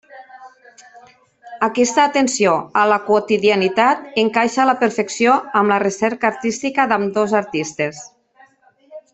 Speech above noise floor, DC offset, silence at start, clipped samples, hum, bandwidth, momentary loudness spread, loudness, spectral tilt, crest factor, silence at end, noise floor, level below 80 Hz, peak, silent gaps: 36 dB; under 0.1%; 0.1 s; under 0.1%; none; 8.4 kHz; 7 LU; -17 LUFS; -4 dB/octave; 16 dB; 0.15 s; -53 dBFS; -62 dBFS; -2 dBFS; none